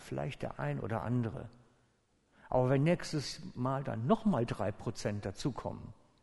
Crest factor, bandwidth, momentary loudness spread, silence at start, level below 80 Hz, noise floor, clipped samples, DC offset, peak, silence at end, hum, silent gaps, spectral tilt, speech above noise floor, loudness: 20 dB; 11.5 kHz; 12 LU; 0 s; -58 dBFS; -73 dBFS; under 0.1%; under 0.1%; -14 dBFS; 0.3 s; none; none; -7 dB/octave; 38 dB; -35 LUFS